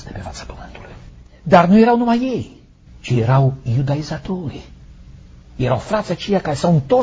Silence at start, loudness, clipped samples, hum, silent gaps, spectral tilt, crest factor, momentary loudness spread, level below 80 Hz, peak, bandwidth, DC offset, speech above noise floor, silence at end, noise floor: 0 s; -17 LUFS; under 0.1%; none; none; -7.5 dB/octave; 18 dB; 23 LU; -40 dBFS; 0 dBFS; 8 kHz; under 0.1%; 24 dB; 0 s; -41 dBFS